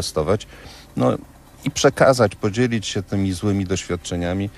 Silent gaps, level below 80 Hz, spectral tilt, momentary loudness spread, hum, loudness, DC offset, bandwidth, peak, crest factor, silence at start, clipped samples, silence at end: none; -46 dBFS; -5 dB/octave; 14 LU; none; -21 LUFS; under 0.1%; 14 kHz; -2 dBFS; 20 dB; 0 s; under 0.1%; 0 s